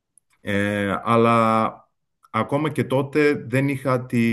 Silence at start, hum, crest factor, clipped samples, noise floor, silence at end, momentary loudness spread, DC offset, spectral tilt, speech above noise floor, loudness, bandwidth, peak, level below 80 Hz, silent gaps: 0.45 s; none; 18 dB; under 0.1%; -62 dBFS; 0 s; 9 LU; under 0.1%; -7 dB/octave; 41 dB; -21 LUFS; 12.5 kHz; -4 dBFS; -64 dBFS; none